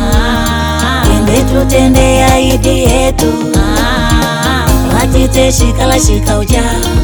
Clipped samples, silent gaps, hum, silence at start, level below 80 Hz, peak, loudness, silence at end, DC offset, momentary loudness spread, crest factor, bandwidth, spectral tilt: 0.5%; none; none; 0 s; -14 dBFS; 0 dBFS; -10 LUFS; 0 s; under 0.1%; 4 LU; 8 dB; over 20 kHz; -5 dB/octave